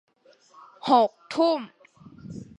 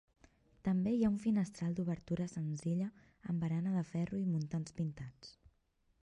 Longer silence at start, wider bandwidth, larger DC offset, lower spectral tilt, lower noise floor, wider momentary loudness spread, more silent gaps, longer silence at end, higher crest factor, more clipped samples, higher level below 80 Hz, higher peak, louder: first, 0.85 s vs 0.65 s; about the same, 11 kHz vs 11 kHz; neither; second, -5.5 dB/octave vs -8 dB/octave; second, -58 dBFS vs -76 dBFS; first, 21 LU vs 11 LU; neither; second, 0.15 s vs 0.7 s; first, 22 dB vs 16 dB; neither; about the same, -66 dBFS vs -66 dBFS; first, -6 dBFS vs -22 dBFS; first, -24 LUFS vs -37 LUFS